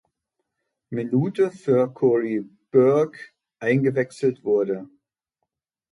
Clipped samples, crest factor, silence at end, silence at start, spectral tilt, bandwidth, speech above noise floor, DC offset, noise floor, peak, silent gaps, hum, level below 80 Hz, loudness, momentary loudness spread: under 0.1%; 18 dB; 1.05 s; 0.9 s; -8.5 dB/octave; 11 kHz; 60 dB; under 0.1%; -81 dBFS; -6 dBFS; none; none; -70 dBFS; -22 LUFS; 11 LU